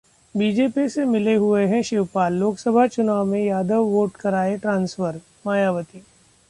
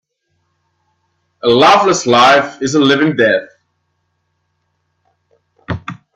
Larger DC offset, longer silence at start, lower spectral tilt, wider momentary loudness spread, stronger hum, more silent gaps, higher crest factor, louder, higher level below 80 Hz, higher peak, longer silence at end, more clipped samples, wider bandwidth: neither; second, 0.35 s vs 1.45 s; first, -6.5 dB/octave vs -4 dB/octave; second, 7 LU vs 16 LU; neither; neither; about the same, 16 dB vs 16 dB; second, -21 LUFS vs -11 LUFS; second, -60 dBFS vs -54 dBFS; second, -6 dBFS vs 0 dBFS; first, 0.5 s vs 0.25 s; neither; about the same, 11.5 kHz vs 12 kHz